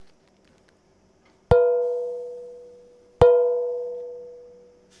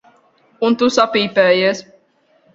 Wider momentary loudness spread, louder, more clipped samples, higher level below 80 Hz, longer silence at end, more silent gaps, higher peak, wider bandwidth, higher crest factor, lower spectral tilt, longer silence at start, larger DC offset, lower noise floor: first, 23 LU vs 7 LU; second, -21 LUFS vs -15 LUFS; neither; first, -44 dBFS vs -60 dBFS; second, 0.6 s vs 0.75 s; neither; about the same, -2 dBFS vs 0 dBFS; second, 5.2 kHz vs 7.8 kHz; about the same, 22 dB vs 18 dB; first, -8 dB/octave vs -4 dB/octave; second, 0 s vs 0.6 s; neither; about the same, -60 dBFS vs -57 dBFS